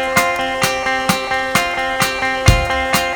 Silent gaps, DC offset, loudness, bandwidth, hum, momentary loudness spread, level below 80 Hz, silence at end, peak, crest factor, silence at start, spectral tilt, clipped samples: none; under 0.1%; -16 LUFS; over 20 kHz; none; 3 LU; -28 dBFS; 0 s; 0 dBFS; 16 dB; 0 s; -3.5 dB/octave; under 0.1%